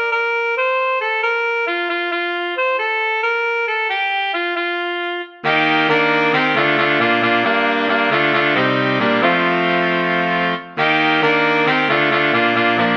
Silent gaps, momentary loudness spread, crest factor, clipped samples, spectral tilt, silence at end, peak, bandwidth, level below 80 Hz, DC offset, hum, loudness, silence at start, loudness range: none; 5 LU; 16 dB; under 0.1%; -6 dB/octave; 0 s; -2 dBFS; 7.4 kHz; -70 dBFS; under 0.1%; none; -16 LUFS; 0 s; 3 LU